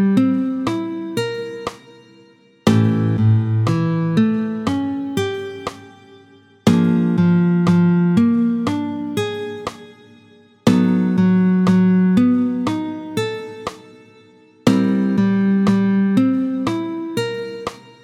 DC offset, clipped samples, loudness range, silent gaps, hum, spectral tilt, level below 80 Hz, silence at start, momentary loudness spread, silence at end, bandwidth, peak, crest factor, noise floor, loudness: under 0.1%; under 0.1%; 4 LU; none; none; -7.5 dB/octave; -54 dBFS; 0 s; 13 LU; 0.25 s; 12.5 kHz; 0 dBFS; 18 dB; -50 dBFS; -18 LUFS